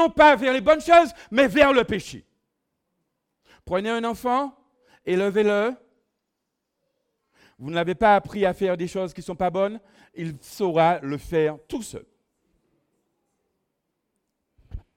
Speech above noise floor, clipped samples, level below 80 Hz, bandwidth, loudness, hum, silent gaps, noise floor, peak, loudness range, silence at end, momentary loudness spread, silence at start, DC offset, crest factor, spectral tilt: 59 dB; under 0.1%; -52 dBFS; 16 kHz; -21 LUFS; none; none; -80 dBFS; -2 dBFS; 8 LU; 0.15 s; 18 LU; 0 s; under 0.1%; 22 dB; -5.5 dB/octave